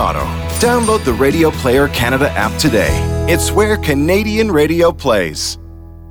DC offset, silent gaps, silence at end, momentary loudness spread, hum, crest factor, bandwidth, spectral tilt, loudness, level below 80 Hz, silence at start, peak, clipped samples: under 0.1%; none; 0 s; 5 LU; none; 12 dB; over 20 kHz; -5 dB/octave; -14 LUFS; -26 dBFS; 0 s; -2 dBFS; under 0.1%